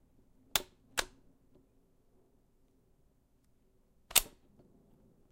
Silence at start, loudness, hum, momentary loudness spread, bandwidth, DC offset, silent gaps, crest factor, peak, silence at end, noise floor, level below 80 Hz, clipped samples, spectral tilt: 0.55 s; -33 LUFS; none; 18 LU; 16 kHz; under 0.1%; none; 38 dB; -6 dBFS; 1.05 s; -70 dBFS; -60 dBFS; under 0.1%; 0.5 dB/octave